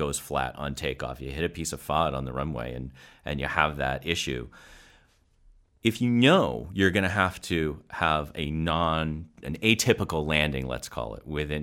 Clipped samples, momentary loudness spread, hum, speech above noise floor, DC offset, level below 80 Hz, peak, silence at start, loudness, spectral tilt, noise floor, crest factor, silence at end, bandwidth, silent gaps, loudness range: under 0.1%; 12 LU; none; 34 dB; under 0.1%; -44 dBFS; -4 dBFS; 0 s; -27 LUFS; -4.5 dB/octave; -62 dBFS; 24 dB; 0 s; 16.5 kHz; none; 6 LU